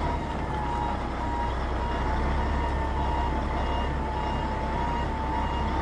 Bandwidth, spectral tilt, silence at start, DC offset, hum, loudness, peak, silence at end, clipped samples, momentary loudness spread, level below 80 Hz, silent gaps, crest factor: 9.8 kHz; -7 dB/octave; 0 s; under 0.1%; none; -29 LUFS; -16 dBFS; 0 s; under 0.1%; 2 LU; -30 dBFS; none; 12 dB